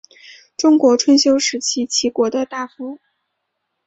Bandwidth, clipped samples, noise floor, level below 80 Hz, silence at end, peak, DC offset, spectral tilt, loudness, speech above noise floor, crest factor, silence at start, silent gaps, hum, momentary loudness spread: 8.2 kHz; under 0.1%; -74 dBFS; -62 dBFS; 0.9 s; -2 dBFS; under 0.1%; -2 dB/octave; -16 LUFS; 59 dB; 16 dB; 0.3 s; none; none; 17 LU